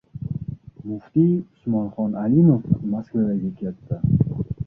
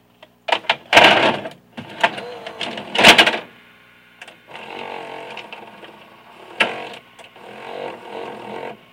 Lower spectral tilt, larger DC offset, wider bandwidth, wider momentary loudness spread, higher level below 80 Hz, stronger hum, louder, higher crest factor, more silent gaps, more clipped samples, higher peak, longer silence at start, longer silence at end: first, -13.5 dB/octave vs -2 dB/octave; neither; second, 1.9 kHz vs 17 kHz; second, 15 LU vs 26 LU; first, -44 dBFS vs -58 dBFS; second, none vs 60 Hz at -55 dBFS; second, -22 LUFS vs -14 LUFS; about the same, 18 dB vs 20 dB; neither; neither; second, -4 dBFS vs 0 dBFS; second, 0.15 s vs 0.5 s; second, 0 s vs 0.2 s